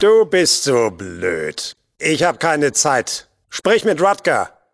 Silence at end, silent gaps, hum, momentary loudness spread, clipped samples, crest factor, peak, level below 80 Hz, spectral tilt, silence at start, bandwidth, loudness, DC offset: 0.25 s; none; none; 11 LU; under 0.1%; 16 dB; -2 dBFS; -56 dBFS; -3 dB/octave; 0 s; 11 kHz; -17 LUFS; under 0.1%